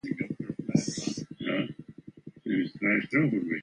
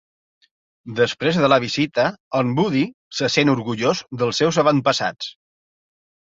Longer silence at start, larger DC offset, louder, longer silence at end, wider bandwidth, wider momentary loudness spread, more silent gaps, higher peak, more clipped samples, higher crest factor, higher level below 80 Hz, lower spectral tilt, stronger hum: second, 0.05 s vs 0.85 s; neither; second, -30 LUFS vs -19 LUFS; second, 0 s vs 0.95 s; first, 10 kHz vs 8 kHz; first, 19 LU vs 8 LU; second, none vs 2.20-2.31 s, 2.94-3.11 s; second, -10 dBFS vs -2 dBFS; neither; about the same, 20 dB vs 18 dB; second, -66 dBFS vs -60 dBFS; about the same, -5.5 dB/octave vs -5 dB/octave; neither